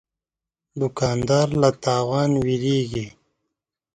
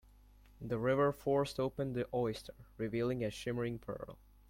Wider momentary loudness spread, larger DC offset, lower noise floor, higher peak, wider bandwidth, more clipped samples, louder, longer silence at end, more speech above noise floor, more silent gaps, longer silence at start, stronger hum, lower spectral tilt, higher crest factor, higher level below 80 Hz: second, 10 LU vs 15 LU; neither; first, -88 dBFS vs -62 dBFS; first, -4 dBFS vs -20 dBFS; second, 9.4 kHz vs 16.5 kHz; neither; first, -21 LUFS vs -37 LUFS; first, 0.85 s vs 0.35 s; first, 68 dB vs 25 dB; neither; first, 0.75 s vs 0.6 s; neither; about the same, -6 dB/octave vs -6.5 dB/octave; about the same, 20 dB vs 18 dB; first, -50 dBFS vs -60 dBFS